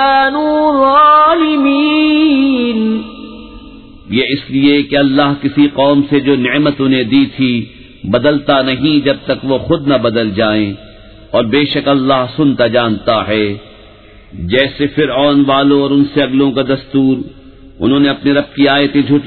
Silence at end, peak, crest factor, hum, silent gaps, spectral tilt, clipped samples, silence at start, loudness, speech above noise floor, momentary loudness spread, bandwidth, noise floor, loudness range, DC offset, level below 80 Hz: 0 s; 0 dBFS; 12 dB; none; none; -9 dB/octave; under 0.1%; 0 s; -11 LUFS; 27 dB; 7 LU; 4.5 kHz; -38 dBFS; 3 LU; 0.3%; -42 dBFS